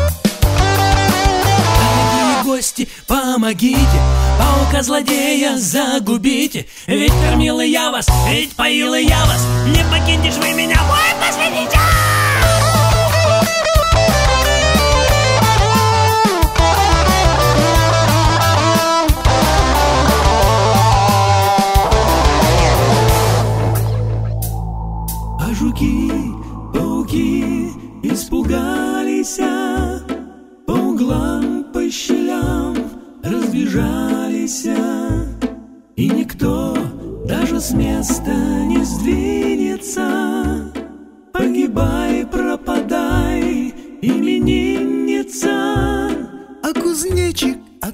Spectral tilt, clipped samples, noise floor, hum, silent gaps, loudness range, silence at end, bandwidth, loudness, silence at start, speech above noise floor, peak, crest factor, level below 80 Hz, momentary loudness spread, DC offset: -4.5 dB/octave; under 0.1%; -37 dBFS; none; none; 7 LU; 0 s; 16.5 kHz; -15 LUFS; 0 s; 22 dB; 0 dBFS; 14 dB; -22 dBFS; 10 LU; under 0.1%